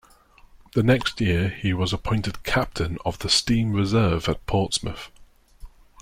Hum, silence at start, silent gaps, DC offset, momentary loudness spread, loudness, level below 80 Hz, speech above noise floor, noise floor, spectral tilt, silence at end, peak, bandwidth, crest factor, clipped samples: none; 0.75 s; none; under 0.1%; 8 LU; -23 LUFS; -40 dBFS; 30 dB; -53 dBFS; -5 dB/octave; 0 s; -4 dBFS; 16 kHz; 20 dB; under 0.1%